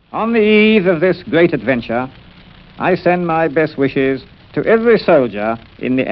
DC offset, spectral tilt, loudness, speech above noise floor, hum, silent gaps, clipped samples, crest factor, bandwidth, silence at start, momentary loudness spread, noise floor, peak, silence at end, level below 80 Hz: under 0.1%; -9.5 dB/octave; -14 LUFS; 27 dB; none; none; under 0.1%; 14 dB; 5.6 kHz; 0.15 s; 11 LU; -41 dBFS; 0 dBFS; 0 s; -46 dBFS